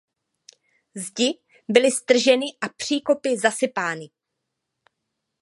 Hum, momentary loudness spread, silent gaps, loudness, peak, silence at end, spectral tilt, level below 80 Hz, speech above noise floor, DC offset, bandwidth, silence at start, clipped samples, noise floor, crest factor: none; 16 LU; none; -21 LUFS; 0 dBFS; 1.35 s; -2.5 dB/octave; -74 dBFS; 59 dB; under 0.1%; 11.5 kHz; 0.95 s; under 0.1%; -81 dBFS; 24 dB